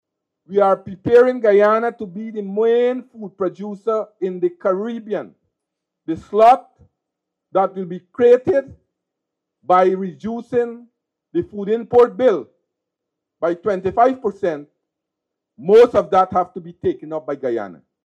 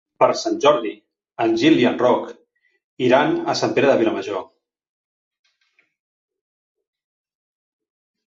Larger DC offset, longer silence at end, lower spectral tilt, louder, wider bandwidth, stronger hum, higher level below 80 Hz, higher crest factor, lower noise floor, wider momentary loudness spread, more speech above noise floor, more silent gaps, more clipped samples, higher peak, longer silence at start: neither; second, 0.3 s vs 3.85 s; first, -7.5 dB/octave vs -5 dB/octave; about the same, -18 LUFS vs -18 LUFS; about the same, 7.8 kHz vs 7.8 kHz; neither; first, -58 dBFS vs -66 dBFS; about the same, 16 dB vs 18 dB; first, -81 dBFS vs -65 dBFS; about the same, 15 LU vs 13 LU; first, 64 dB vs 47 dB; second, none vs 2.84-2.97 s; neither; about the same, -2 dBFS vs -2 dBFS; first, 0.5 s vs 0.2 s